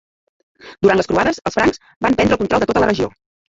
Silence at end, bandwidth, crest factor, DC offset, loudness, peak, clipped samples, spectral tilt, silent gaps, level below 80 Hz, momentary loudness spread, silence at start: 0.5 s; 8 kHz; 16 dB; under 0.1%; -17 LUFS; -2 dBFS; under 0.1%; -5.5 dB/octave; 1.96-2.01 s; -42 dBFS; 5 LU; 0.65 s